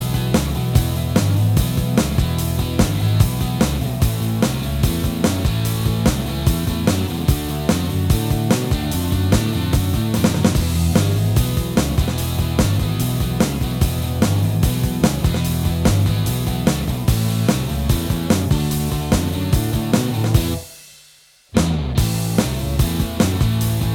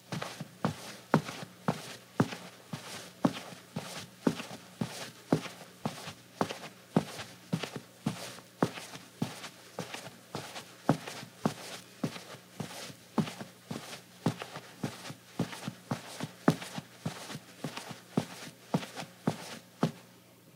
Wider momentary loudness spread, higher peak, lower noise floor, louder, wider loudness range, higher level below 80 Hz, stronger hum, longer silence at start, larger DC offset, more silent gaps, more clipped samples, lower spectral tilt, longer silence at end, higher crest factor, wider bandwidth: second, 3 LU vs 11 LU; first, -2 dBFS vs -6 dBFS; second, -50 dBFS vs -57 dBFS; first, -19 LUFS vs -38 LUFS; about the same, 2 LU vs 3 LU; first, -26 dBFS vs -76 dBFS; neither; about the same, 0 s vs 0 s; neither; neither; neither; about the same, -6 dB/octave vs -5.5 dB/octave; about the same, 0 s vs 0 s; second, 16 dB vs 30 dB; first, 19 kHz vs 16 kHz